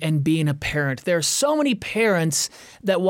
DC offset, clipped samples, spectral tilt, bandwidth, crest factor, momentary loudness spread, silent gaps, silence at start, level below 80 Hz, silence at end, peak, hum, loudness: under 0.1%; under 0.1%; -4.5 dB/octave; 17 kHz; 14 dB; 5 LU; none; 0 s; -50 dBFS; 0 s; -8 dBFS; none; -21 LUFS